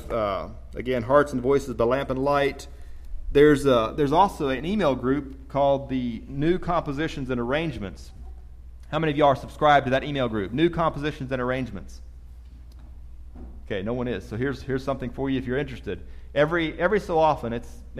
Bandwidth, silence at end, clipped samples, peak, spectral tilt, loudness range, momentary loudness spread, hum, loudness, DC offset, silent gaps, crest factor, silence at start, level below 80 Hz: 14.5 kHz; 0 s; under 0.1%; -6 dBFS; -6.5 dB/octave; 9 LU; 16 LU; none; -24 LUFS; under 0.1%; none; 20 dB; 0 s; -40 dBFS